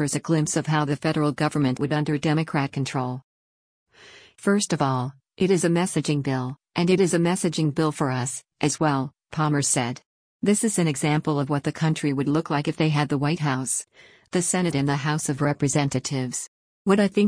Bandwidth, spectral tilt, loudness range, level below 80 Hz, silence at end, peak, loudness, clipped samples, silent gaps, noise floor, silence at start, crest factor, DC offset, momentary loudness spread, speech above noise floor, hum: 10.5 kHz; -5 dB/octave; 3 LU; -60 dBFS; 0 s; -8 dBFS; -24 LUFS; under 0.1%; 3.24-3.86 s, 10.06-10.40 s, 16.48-16.85 s; -50 dBFS; 0 s; 16 dB; under 0.1%; 8 LU; 27 dB; none